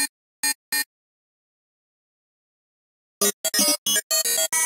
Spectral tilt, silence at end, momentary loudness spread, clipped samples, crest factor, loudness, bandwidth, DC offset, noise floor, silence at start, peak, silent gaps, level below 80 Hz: 0.5 dB/octave; 0 s; 7 LU; under 0.1%; 20 dB; -21 LUFS; 18 kHz; under 0.1%; under -90 dBFS; 0 s; -6 dBFS; 0.09-0.43 s, 0.55-0.72 s, 0.86-3.21 s, 3.33-3.44 s, 3.78-3.86 s, 4.03-4.10 s; -84 dBFS